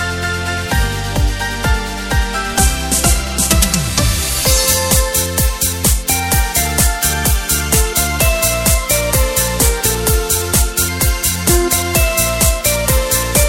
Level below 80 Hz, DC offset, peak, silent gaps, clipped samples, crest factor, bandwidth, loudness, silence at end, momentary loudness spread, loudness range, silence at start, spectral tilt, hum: -20 dBFS; under 0.1%; 0 dBFS; none; under 0.1%; 14 dB; 17 kHz; -14 LUFS; 0 s; 5 LU; 2 LU; 0 s; -3 dB/octave; none